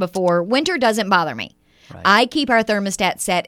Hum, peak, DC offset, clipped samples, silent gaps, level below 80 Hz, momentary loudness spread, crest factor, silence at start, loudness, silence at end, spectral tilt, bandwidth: none; 0 dBFS; under 0.1%; under 0.1%; none; -54 dBFS; 7 LU; 18 dB; 0 s; -17 LUFS; 0.05 s; -3.5 dB/octave; 16.5 kHz